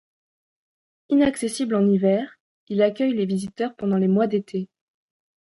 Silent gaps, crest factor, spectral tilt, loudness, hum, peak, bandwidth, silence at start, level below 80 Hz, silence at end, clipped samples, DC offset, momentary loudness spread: 2.40-2.67 s; 16 dB; -6.5 dB/octave; -22 LUFS; none; -8 dBFS; 11.5 kHz; 1.1 s; -62 dBFS; 0.75 s; under 0.1%; under 0.1%; 10 LU